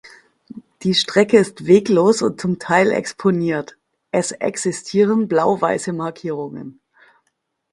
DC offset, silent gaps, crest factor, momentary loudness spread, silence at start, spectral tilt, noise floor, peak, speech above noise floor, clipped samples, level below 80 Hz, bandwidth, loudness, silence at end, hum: under 0.1%; none; 18 dB; 12 LU; 0.05 s; -5 dB/octave; -71 dBFS; 0 dBFS; 54 dB; under 0.1%; -60 dBFS; 11.5 kHz; -18 LUFS; 1 s; none